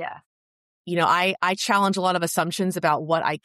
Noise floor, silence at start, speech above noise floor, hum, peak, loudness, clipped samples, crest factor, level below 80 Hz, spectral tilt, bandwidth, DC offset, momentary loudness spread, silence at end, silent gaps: under -90 dBFS; 0 s; over 67 dB; none; -8 dBFS; -22 LUFS; under 0.1%; 16 dB; -72 dBFS; -4 dB/octave; 14 kHz; under 0.1%; 5 LU; 0.1 s; 0.26-0.85 s